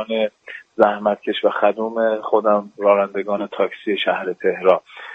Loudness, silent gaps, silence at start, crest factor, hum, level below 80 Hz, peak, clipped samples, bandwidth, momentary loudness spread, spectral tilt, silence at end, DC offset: -19 LUFS; none; 0 s; 18 dB; none; -66 dBFS; 0 dBFS; under 0.1%; 5.2 kHz; 6 LU; -6.5 dB/octave; 0 s; under 0.1%